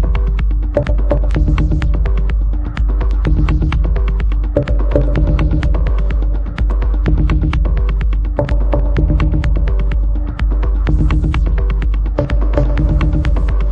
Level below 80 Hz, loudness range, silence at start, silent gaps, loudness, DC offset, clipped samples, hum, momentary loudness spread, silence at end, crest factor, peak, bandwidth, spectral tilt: -14 dBFS; 1 LU; 0 s; none; -16 LUFS; under 0.1%; under 0.1%; none; 3 LU; 0 s; 12 dB; 0 dBFS; 4.7 kHz; -9 dB/octave